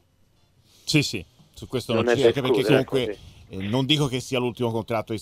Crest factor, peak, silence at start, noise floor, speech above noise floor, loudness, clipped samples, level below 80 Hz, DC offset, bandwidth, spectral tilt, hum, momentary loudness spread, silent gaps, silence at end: 20 dB; -4 dBFS; 0.85 s; -61 dBFS; 38 dB; -23 LUFS; under 0.1%; -54 dBFS; under 0.1%; 16 kHz; -5 dB/octave; none; 15 LU; none; 0 s